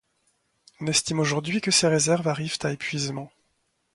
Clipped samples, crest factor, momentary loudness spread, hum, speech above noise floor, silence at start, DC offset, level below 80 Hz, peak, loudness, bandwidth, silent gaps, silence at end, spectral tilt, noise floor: under 0.1%; 20 dB; 12 LU; none; 48 dB; 0.8 s; under 0.1%; -62 dBFS; -6 dBFS; -24 LUFS; 11.5 kHz; none; 0.7 s; -3.5 dB/octave; -72 dBFS